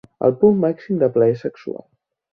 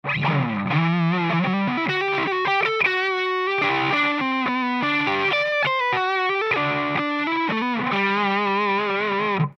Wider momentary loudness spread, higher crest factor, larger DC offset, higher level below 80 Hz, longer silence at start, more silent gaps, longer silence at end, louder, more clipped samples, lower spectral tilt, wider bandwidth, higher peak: first, 17 LU vs 3 LU; about the same, 16 dB vs 14 dB; neither; about the same, -60 dBFS vs -64 dBFS; first, 0.2 s vs 0.05 s; neither; first, 0.6 s vs 0.05 s; first, -18 LUFS vs -21 LUFS; neither; first, -10.5 dB/octave vs -6.5 dB/octave; second, 5.6 kHz vs 7.4 kHz; first, -2 dBFS vs -8 dBFS